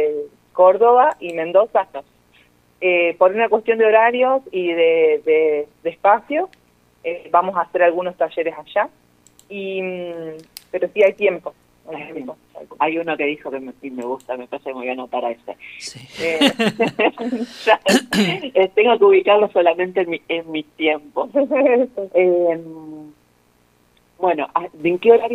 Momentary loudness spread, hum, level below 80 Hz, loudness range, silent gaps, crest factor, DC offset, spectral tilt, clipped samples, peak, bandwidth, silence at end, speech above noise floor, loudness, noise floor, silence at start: 17 LU; 60 Hz at -60 dBFS; -64 dBFS; 9 LU; none; 18 dB; under 0.1%; -4.5 dB/octave; under 0.1%; 0 dBFS; 15 kHz; 0 s; 40 dB; -18 LUFS; -58 dBFS; 0 s